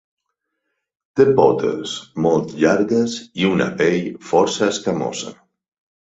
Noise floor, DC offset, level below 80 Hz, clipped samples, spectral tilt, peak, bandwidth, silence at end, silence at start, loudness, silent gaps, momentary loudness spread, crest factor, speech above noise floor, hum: -76 dBFS; under 0.1%; -56 dBFS; under 0.1%; -5 dB/octave; -2 dBFS; 8 kHz; 0.8 s; 1.15 s; -18 LUFS; none; 11 LU; 18 dB; 59 dB; none